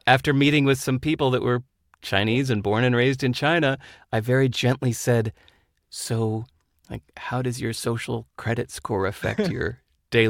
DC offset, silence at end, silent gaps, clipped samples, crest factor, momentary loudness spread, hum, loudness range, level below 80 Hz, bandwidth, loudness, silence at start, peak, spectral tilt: under 0.1%; 0 s; none; under 0.1%; 22 dB; 13 LU; none; 7 LU; -52 dBFS; 16.5 kHz; -23 LUFS; 0.05 s; -2 dBFS; -5.5 dB/octave